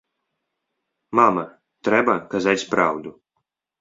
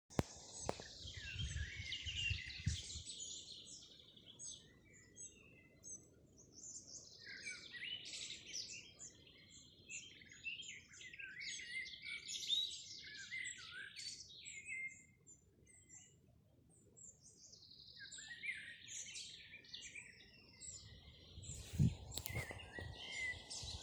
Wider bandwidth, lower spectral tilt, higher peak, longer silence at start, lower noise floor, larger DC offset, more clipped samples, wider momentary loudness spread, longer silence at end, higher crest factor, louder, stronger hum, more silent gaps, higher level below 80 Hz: second, 7.8 kHz vs over 20 kHz; first, -5 dB/octave vs -3 dB/octave; first, -2 dBFS vs -16 dBFS; first, 1.1 s vs 0.1 s; first, -78 dBFS vs -70 dBFS; neither; neither; second, 14 LU vs 18 LU; first, 0.7 s vs 0 s; second, 22 dB vs 32 dB; first, -20 LUFS vs -47 LUFS; neither; neither; about the same, -62 dBFS vs -62 dBFS